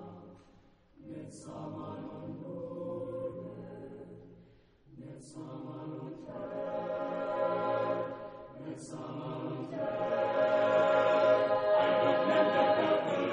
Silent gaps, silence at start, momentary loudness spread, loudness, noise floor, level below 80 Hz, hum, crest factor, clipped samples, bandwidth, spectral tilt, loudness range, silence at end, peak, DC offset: none; 0 s; 20 LU; -31 LUFS; -62 dBFS; -70 dBFS; none; 18 dB; under 0.1%; 10 kHz; -6 dB/octave; 16 LU; 0 s; -14 dBFS; under 0.1%